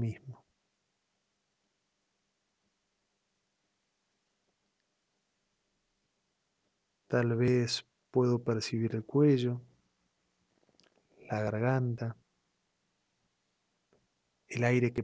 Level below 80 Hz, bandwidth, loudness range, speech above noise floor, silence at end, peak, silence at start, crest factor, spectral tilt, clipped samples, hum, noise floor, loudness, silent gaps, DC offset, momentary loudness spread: -68 dBFS; 8 kHz; 7 LU; 51 dB; 0 s; -14 dBFS; 0 s; 22 dB; -6.5 dB/octave; under 0.1%; none; -81 dBFS; -31 LUFS; none; under 0.1%; 12 LU